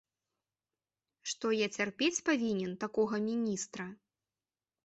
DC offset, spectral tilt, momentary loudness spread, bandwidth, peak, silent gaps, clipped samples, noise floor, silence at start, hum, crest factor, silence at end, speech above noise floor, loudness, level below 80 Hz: under 0.1%; -3.5 dB/octave; 10 LU; 8.4 kHz; -18 dBFS; none; under 0.1%; under -90 dBFS; 1.25 s; none; 18 dB; 0.9 s; over 56 dB; -34 LUFS; -76 dBFS